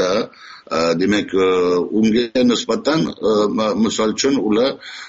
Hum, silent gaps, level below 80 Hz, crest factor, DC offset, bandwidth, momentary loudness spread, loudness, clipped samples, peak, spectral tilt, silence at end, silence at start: none; none; -52 dBFS; 14 dB; under 0.1%; 8 kHz; 4 LU; -17 LUFS; under 0.1%; -4 dBFS; -4 dB/octave; 0 s; 0 s